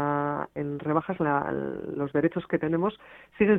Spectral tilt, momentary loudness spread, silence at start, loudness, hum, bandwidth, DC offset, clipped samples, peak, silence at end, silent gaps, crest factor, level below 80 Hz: -10 dB/octave; 6 LU; 0 s; -28 LUFS; none; 4 kHz; under 0.1%; under 0.1%; -10 dBFS; 0 s; none; 18 dB; -60 dBFS